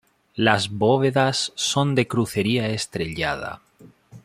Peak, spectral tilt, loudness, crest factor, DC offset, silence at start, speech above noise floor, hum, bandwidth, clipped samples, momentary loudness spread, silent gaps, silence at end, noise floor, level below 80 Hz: -2 dBFS; -4.5 dB/octave; -22 LUFS; 20 dB; under 0.1%; 0.35 s; 28 dB; none; 15.5 kHz; under 0.1%; 10 LU; none; 0.05 s; -49 dBFS; -54 dBFS